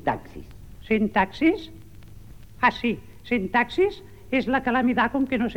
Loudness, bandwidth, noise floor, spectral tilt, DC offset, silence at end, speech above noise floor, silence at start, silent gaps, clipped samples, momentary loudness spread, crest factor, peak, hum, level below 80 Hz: -24 LUFS; 16.5 kHz; -45 dBFS; -6.5 dB/octave; 0.4%; 0 s; 22 dB; 0 s; none; under 0.1%; 13 LU; 18 dB; -6 dBFS; none; -48 dBFS